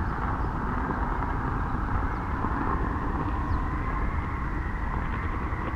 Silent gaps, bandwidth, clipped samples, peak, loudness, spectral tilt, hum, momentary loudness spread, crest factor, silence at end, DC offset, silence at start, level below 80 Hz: none; 7 kHz; under 0.1%; -14 dBFS; -30 LUFS; -8.5 dB/octave; none; 3 LU; 14 dB; 0 s; under 0.1%; 0 s; -32 dBFS